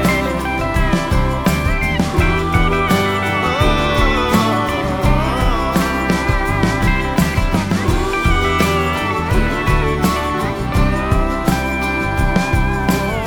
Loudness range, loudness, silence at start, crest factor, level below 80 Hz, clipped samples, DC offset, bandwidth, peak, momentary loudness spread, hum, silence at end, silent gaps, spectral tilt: 2 LU; -16 LUFS; 0 s; 14 dB; -22 dBFS; under 0.1%; under 0.1%; 19 kHz; -2 dBFS; 3 LU; none; 0 s; none; -5.5 dB/octave